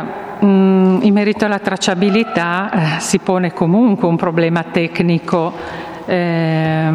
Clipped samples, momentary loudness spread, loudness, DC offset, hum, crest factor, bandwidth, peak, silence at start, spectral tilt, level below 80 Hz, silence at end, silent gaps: under 0.1%; 6 LU; -15 LUFS; under 0.1%; none; 14 dB; 12.5 kHz; 0 dBFS; 0 s; -6 dB/octave; -52 dBFS; 0 s; none